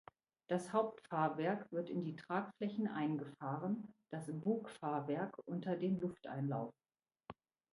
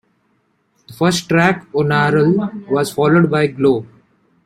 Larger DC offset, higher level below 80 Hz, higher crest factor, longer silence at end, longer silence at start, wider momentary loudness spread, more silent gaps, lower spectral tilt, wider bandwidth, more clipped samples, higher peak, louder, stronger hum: neither; second, -82 dBFS vs -54 dBFS; first, 20 dB vs 14 dB; second, 0.4 s vs 0.6 s; second, 0.5 s vs 0.9 s; about the same, 8 LU vs 6 LU; neither; first, -7.5 dB/octave vs -6 dB/octave; second, 11.5 kHz vs 15 kHz; neither; second, -22 dBFS vs -2 dBFS; second, -41 LUFS vs -15 LUFS; neither